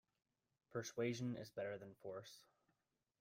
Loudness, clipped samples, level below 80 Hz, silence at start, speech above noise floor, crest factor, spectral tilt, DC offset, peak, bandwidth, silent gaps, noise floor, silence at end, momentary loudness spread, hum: -48 LUFS; under 0.1%; -84 dBFS; 0.7 s; 41 dB; 20 dB; -5.5 dB/octave; under 0.1%; -30 dBFS; 16 kHz; none; -89 dBFS; 0.8 s; 12 LU; none